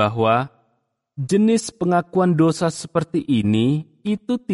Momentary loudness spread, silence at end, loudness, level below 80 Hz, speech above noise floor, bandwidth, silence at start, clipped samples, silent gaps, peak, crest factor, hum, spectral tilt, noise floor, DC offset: 9 LU; 0 s; -20 LUFS; -56 dBFS; 51 dB; 11.5 kHz; 0 s; under 0.1%; none; -6 dBFS; 14 dB; none; -6.5 dB/octave; -70 dBFS; under 0.1%